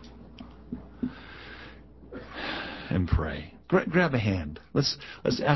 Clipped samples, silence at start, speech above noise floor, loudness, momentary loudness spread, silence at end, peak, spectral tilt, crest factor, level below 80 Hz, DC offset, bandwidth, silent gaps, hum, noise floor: under 0.1%; 0 s; 22 dB; -29 LUFS; 21 LU; 0 s; -8 dBFS; -6 dB/octave; 22 dB; -40 dBFS; 0.1%; 6.2 kHz; none; none; -48 dBFS